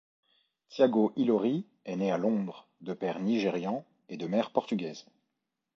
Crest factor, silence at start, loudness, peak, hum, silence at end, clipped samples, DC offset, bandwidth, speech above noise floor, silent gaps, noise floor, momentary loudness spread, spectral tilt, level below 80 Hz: 20 dB; 0.7 s; -30 LUFS; -10 dBFS; none; 0.75 s; under 0.1%; under 0.1%; 7.4 kHz; 55 dB; none; -84 dBFS; 14 LU; -7 dB/octave; -78 dBFS